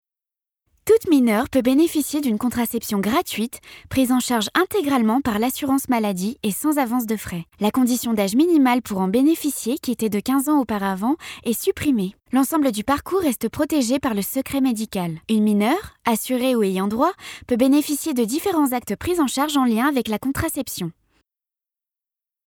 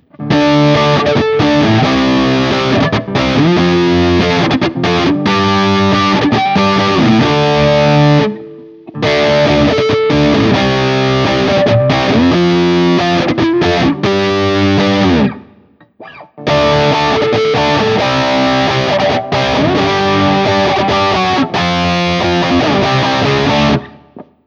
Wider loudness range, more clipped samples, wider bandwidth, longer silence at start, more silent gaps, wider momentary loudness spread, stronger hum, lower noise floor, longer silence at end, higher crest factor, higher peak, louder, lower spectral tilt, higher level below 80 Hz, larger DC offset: about the same, 2 LU vs 2 LU; neither; first, over 20 kHz vs 8 kHz; first, 0.85 s vs 0.2 s; neither; first, 7 LU vs 3 LU; neither; first, -87 dBFS vs -45 dBFS; first, 1.55 s vs 0.25 s; first, 18 dB vs 12 dB; second, -4 dBFS vs 0 dBFS; second, -21 LUFS vs -11 LUFS; second, -4.5 dB/octave vs -6 dB/octave; second, -52 dBFS vs -34 dBFS; neither